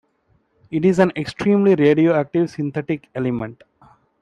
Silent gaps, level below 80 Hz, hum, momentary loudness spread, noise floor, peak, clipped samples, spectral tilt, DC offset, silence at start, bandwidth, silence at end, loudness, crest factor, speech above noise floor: none; -56 dBFS; none; 12 LU; -63 dBFS; -2 dBFS; under 0.1%; -8 dB/octave; under 0.1%; 0.7 s; 10 kHz; 0.7 s; -19 LUFS; 18 dB; 45 dB